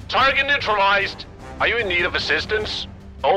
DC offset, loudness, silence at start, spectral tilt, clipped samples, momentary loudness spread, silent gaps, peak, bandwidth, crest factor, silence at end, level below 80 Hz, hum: under 0.1%; -19 LUFS; 0 s; -3.5 dB/octave; under 0.1%; 12 LU; none; -6 dBFS; 13.5 kHz; 14 dB; 0 s; -42 dBFS; none